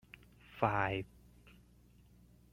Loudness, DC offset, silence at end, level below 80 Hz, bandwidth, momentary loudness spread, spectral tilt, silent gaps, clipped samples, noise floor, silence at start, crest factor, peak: -36 LUFS; under 0.1%; 1.45 s; -62 dBFS; 16 kHz; 24 LU; -7 dB/octave; none; under 0.1%; -64 dBFS; 0.5 s; 26 dB; -14 dBFS